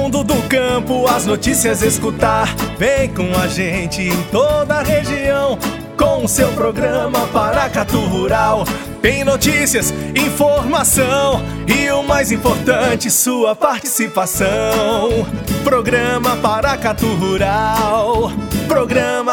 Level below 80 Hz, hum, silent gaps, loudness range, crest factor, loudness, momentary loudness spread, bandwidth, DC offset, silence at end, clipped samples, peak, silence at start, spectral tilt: -32 dBFS; none; none; 2 LU; 16 dB; -15 LUFS; 4 LU; 19.5 kHz; under 0.1%; 0 s; under 0.1%; 0 dBFS; 0 s; -4 dB/octave